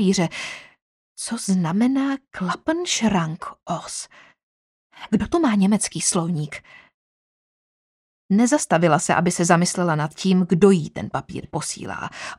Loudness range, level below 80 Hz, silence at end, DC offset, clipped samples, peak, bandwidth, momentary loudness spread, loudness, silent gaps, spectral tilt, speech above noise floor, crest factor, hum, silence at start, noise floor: 5 LU; -54 dBFS; 0.05 s; under 0.1%; under 0.1%; -2 dBFS; 13 kHz; 13 LU; -21 LUFS; 0.82-1.16 s, 4.43-4.90 s, 6.94-8.29 s; -5 dB/octave; over 69 dB; 20 dB; none; 0 s; under -90 dBFS